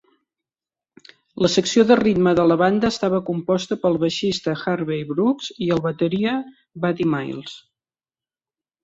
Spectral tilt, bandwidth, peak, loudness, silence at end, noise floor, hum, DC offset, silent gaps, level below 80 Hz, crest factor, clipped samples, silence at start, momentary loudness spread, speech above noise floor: -5.5 dB/octave; 8 kHz; -2 dBFS; -20 LUFS; 1.25 s; under -90 dBFS; none; under 0.1%; none; -56 dBFS; 18 dB; under 0.1%; 1.35 s; 10 LU; over 70 dB